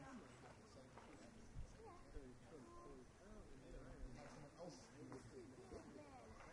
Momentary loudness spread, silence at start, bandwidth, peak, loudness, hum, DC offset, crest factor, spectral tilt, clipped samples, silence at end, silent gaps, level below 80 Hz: 4 LU; 0 s; 11 kHz; -42 dBFS; -61 LUFS; none; under 0.1%; 18 dB; -5.5 dB/octave; under 0.1%; 0 s; none; -66 dBFS